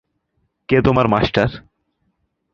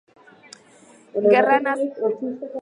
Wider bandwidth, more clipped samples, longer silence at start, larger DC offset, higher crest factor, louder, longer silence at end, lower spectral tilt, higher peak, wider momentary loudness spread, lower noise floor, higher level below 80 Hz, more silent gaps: second, 7.2 kHz vs 10.5 kHz; neither; second, 0.7 s vs 1.15 s; neither; about the same, 20 dB vs 20 dB; first, -17 LUFS vs -20 LUFS; first, 0.95 s vs 0 s; first, -8 dB/octave vs -5.5 dB/octave; first, 0 dBFS vs -4 dBFS; second, 7 LU vs 13 LU; first, -69 dBFS vs -51 dBFS; first, -38 dBFS vs -76 dBFS; neither